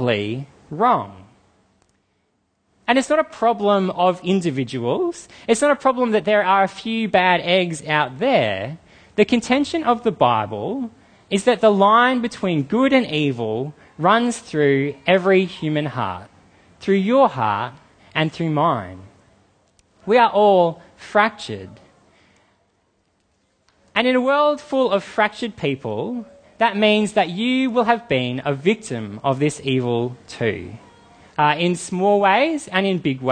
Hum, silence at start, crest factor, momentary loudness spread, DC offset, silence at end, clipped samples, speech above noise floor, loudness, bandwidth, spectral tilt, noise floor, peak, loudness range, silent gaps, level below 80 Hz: none; 0 s; 18 dB; 12 LU; under 0.1%; 0 s; under 0.1%; 49 dB; -19 LUFS; 9.8 kHz; -5.5 dB/octave; -68 dBFS; 0 dBFS; 4 LU; none; -60 dBFS